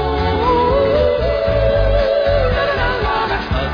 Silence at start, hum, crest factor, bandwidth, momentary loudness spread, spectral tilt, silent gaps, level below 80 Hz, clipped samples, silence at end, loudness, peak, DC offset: 0 s; none; 12 dB; 5.2 kHz; 3 LU; -7.5 dB/octave; none; -24 dBFS; under 0.1%; 0 s; -16 LUFS; -4 dBFS; under 0.1%